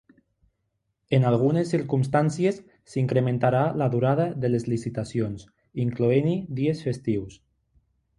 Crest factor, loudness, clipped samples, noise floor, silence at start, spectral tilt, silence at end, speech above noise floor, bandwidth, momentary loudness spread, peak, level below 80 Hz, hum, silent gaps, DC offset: 18 dB; -25 LUFS; under 0.1%; -77 dBFS; 1.1 s; -8 dB/octave; 0.85 s; 53 dB; 11 kHz; 8 LU; -8 dBFS; -56 dBFS; none; none; under 0.1%